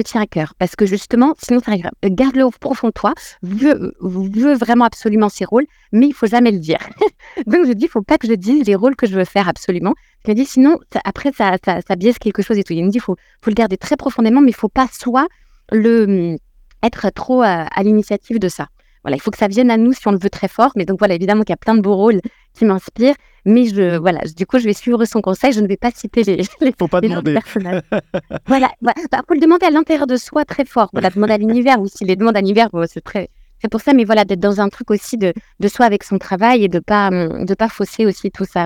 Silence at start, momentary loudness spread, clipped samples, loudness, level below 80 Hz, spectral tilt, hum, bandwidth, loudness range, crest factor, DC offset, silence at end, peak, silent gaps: 0 s; 8 LU; under 0.1%; -15 LUFS; -46 dBFS; -6.5 dB/octave; none; 16 kHz; 2 LU; 14 dB; under 0.1%; 0 s; 0 dBFS; none